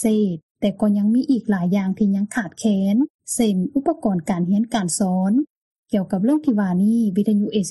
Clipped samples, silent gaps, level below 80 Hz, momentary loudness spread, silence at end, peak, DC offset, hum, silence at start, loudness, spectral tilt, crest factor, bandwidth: under 0.1%; 0.42-0.55 s, 3.10-3.19 s, 5.50-5.83 s; -56 dBFS; 5 LU; 0 s; -8 dBFS; under 0.1%; none; 0 s; -20 LUFS; -6 dB/octave; 12 dB; 12 kHz